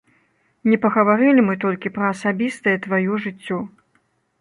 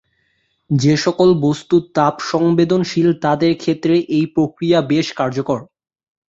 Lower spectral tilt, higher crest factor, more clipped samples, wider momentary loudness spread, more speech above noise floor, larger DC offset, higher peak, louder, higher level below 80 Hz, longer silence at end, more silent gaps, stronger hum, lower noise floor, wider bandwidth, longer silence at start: about the same, -7 dB/octave vs -6.5 dB/octave; about the same, 18 dB vs 14 dB; neither; first, 12 LU vs 6 LU; about the same, 46 dB vs 49 dB; neither; about the same, -2 dBFS vs -2 dBFS; second, -19 LUFS vs -16 LUFS; second, -64 dBFS vs -54 dBFS; about the same, 0.75 s vs 0.65 s; neither; neither; about the same, -65 dBFS vs -64 dBFS; first, 11 kHz vs 7.8 kHz; about the same, 0.65 s vs 0.7 s